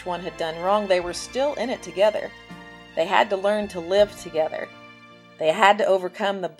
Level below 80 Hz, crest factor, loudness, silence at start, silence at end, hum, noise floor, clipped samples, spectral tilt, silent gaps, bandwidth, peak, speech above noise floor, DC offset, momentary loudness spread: -56 dBFS; 24 dB; -23 LUFS; 0 s; 0.05 s; none; -48 dBFS; under 0.1%; -4 dB/octave; none; 13 kHz; 0 dBFS; 25 dB; under 0.1%; 15 LU